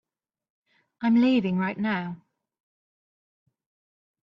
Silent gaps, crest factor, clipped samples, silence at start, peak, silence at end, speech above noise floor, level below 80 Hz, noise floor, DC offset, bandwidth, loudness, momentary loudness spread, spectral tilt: none; 16 dB; under 0.1%; 1 s; -14 dBFS; 2.15 s; over 67 dB; -70 dBFS; under -90 dBFS; under 0.1%; 6 kHz; -24 LUFS; 14 LU; -8.5 dB/octave